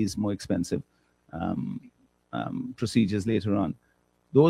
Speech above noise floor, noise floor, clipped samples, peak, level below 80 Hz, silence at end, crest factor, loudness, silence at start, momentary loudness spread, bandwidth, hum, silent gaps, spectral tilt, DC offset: 29 dB; -57 dBFS; under 0.1%; -8 dBFS; -60 dBFS; 0 s; 20 dB; -29 LUFS; 0 s; 12 LU; 13 kHz; none; none; -7 dB/octave; under 0.1%